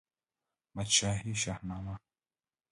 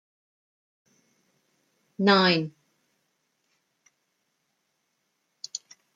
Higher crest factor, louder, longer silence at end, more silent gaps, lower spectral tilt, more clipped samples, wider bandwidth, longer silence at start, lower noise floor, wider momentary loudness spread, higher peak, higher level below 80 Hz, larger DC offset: about the same, 26 dB vs 24 dB; second, -32 LUFS vs -23 LUFS; first, 0.75 s vs 0.4 s; neither; second, -2.5 dB/octave vs -4.5 dB/octave; neither; first, 11.5 kHz vs 7.8 kHz; second, 0.75 s vs 2 s; first, under -90 dBFS vs -76 dBFS; second, 18 LU vs 22 LU; second, -12 dBFS vs -8 dBFS; first, -56 dBFS vs -78 dBFS; neither